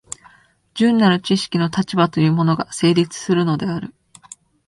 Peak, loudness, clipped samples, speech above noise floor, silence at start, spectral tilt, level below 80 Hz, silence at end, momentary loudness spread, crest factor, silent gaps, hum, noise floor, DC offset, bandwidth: 0 dBFS; -18 LUFS; under 0.1%; 35 dB; 0.75 s; -6 dB/octave; -56 dBFS; 0.8 s; 15 LU; 18 dB; none; none; -52 dBFS; under 0.1%; 11.5 kHz